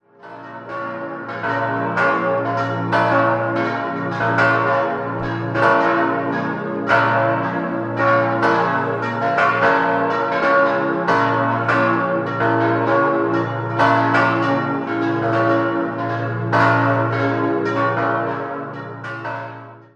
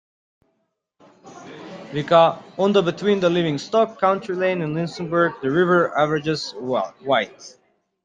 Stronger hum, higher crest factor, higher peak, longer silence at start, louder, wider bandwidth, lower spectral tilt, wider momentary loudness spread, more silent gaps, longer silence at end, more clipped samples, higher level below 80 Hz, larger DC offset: neither; about the same, 16 dB vs 18 dB; about the same, -2 dBFS vs -2 dBFS; second, 0.25 s vs 1.25 s; about the same, -18 LUFS vs -20 LUFS; about the same, 9.2 kHz vs 9.4 kHz; first, -7.5 dB/octave vs -6 dB/octave; about the same, 12 LU vs 12 LU; neither; second, 0.15 s vs 0.55 s; neither; first, -56 dBFS vs -62 dBFS; neither